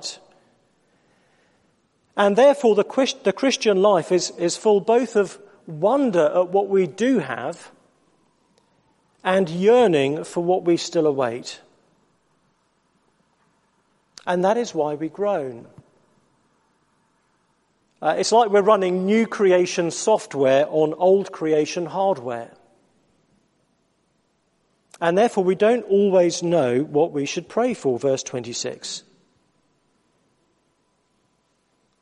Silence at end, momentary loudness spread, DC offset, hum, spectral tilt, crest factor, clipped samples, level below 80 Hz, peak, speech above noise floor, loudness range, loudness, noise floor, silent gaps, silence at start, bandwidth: 3.05 s; 13 LU; under 0.1%; none; -5 dB/octave; 18 dB; under 0.1%; -72 dBFS; -4 dBFS; 48 dB; 11 LU; -20 LUFS; -67 dBFS; none; 0 s; 11.5 kHz